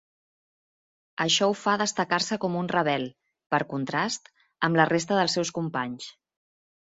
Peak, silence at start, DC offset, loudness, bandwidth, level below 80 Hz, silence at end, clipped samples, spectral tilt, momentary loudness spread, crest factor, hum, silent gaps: -4 dBFS; 1.2 s; under 0.1%; -26 LUFS; 8.4 kHz; -68 dBFS; 0.75 s; under 0.1%; -3.5 dB/octave; 12 LU; 24 dB; none; 3.46-3.50 s